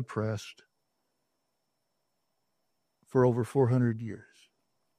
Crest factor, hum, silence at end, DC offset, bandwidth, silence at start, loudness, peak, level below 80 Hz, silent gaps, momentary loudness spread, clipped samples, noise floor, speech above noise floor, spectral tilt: 20 dB; none; 0.8 s; under 0.1%; 11.5 kHz; 0 s; -29 LUFS; -12 dBFS; -70 dBFS; none; 17 LU; under 0.1%; -81 dBFS; 53 dB; -8 dB/octave